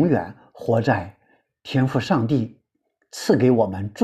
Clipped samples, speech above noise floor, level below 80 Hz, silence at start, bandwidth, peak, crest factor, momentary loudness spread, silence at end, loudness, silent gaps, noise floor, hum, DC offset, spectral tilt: under 0.1%; 51 dB; -56 dBFS; 0 s; 14 kHz; -4 dBFS; 18 dB; 18 LU; 0 s; -21 LUFS; none; -72 dBFS; none; under 0.1%; -7 dB/octave